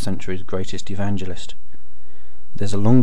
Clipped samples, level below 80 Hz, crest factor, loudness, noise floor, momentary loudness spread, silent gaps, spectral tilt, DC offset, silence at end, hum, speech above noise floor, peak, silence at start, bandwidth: under 0.1%; -44 dBFS; 18 dB; -26 LUFS; -48 dBFS; 17 LU; none; -7 dB/octave; 20%; 0 s; none; 27 dB; -2 dBFS; 0 s; 12 kHz